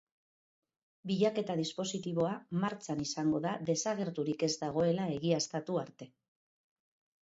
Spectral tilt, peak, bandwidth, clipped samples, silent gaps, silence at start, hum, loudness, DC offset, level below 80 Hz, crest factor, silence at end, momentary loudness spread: -5 dB/octave; -18 dBFS; 8 kHz; under 0.1%; none; 1.05 s; none; -34 LUFS; under 0.1%; -72 dBFS; 18 dB; 1.15 s; 6 LU